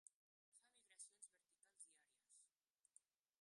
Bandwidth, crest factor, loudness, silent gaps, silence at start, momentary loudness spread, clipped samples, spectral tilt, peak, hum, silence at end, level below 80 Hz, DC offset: 11.5 kHz; 26 dB; -64 LUFS; 0.14-0.52 s; 0.05 s; 5 LU; under 0.1%; 2.5 dB/octave; -46 dBFS; none; 0.4 s; under -90 dBFS; under 0.1%